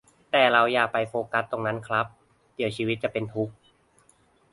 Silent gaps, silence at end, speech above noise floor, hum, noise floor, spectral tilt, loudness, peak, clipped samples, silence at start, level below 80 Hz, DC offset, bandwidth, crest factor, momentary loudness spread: none; 1 s; 37 dB; none; -62 dBFS; -5.5 dB/octave; -25 LUFS; -6 dBFS; under 0.1%; 0.35 s; -64 dBFS; under 0.1%; 11.5 kHz; 22 dB; 12 LU